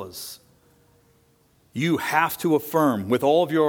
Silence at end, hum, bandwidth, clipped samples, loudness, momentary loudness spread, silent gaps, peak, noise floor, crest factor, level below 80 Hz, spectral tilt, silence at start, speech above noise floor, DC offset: 0 s; none; 19.5 kHz; under 0.1%; -22 LUFS; 17 LU; none; -4 dBFS; -61 dBFS; 20 dB; -66 dBFS; -5.5 dB/octave; 0 s; 39 dB; under 0.1%